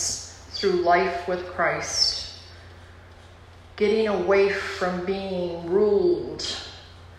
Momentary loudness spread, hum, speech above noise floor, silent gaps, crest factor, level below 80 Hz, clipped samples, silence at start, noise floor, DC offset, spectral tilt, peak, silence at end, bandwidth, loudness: 15 LU; none; 24 dB; none; 16 dB; -52 dBFS; under 0.1%; 0 s; -47 dBFS; under 0.1%; -3.5 dB/octave; -8 dBFS; 0 s; 12.5 kHz; -24 LUFS